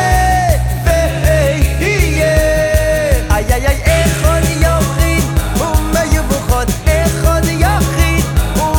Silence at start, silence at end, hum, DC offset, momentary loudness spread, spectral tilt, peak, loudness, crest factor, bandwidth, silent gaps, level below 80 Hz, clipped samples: 0 s; 0 s; none; under 0.1%; 3 LU; -5 dB/octave; 0 dBFS; -13 LUFS; 12 dB; 18.5 kHz; none; -16 dBFS; under 0.1%